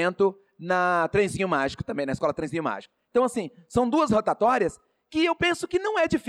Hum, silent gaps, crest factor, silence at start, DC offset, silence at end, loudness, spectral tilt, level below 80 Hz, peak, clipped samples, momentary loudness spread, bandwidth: none; none; 12 dB; 0 s; under 0.1%; 0 s; -25 LUFS; -5.5 dB/octave; -54 dBFS; -12 dBFS; under 0.1%; 8 LU; 13.5 kHz